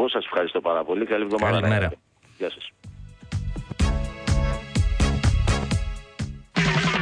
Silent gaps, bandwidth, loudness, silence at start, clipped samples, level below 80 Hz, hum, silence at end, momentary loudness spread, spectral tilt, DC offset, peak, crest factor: none; 10.5 kHz; -25 LUFS; 0 s; under 0.1%; -30 dBFS; none; 0 s; 13 LU; -5.5 dB/octave; under 0.1%; -10 dBFS; 14 dB